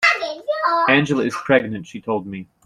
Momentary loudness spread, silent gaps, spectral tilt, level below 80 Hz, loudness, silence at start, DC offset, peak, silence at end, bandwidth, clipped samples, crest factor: 13 LU; none; -5 dB/octave; -58 dBFS; -19 LUFS; 0 s; under 0.1%; -2 dBFS; 0.2 s; 13 kHz; under 0.1%; 18 dB